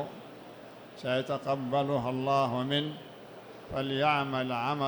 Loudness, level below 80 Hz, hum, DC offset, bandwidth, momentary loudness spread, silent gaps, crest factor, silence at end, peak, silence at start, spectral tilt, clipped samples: -31 LUFS; -66 dBFS; none; under 0.1%; 19.5 kHz; 20 LU; none; 18 dB; 0 s; -14 dBFS; 0 s; -6.5 dB/octave; under 0.1%